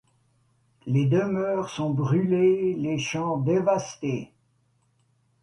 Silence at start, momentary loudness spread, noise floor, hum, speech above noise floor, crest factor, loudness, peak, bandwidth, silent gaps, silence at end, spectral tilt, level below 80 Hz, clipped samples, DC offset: 0.85 s; 10 LU; -67 dBFS; none; 44 dB; 16 dB; -25 LUFS; -10 dBFS; 11.5 kHz; none; 1.15 s; -7 dB/octave; -62 dBFS; under 0.1%; under 0.1%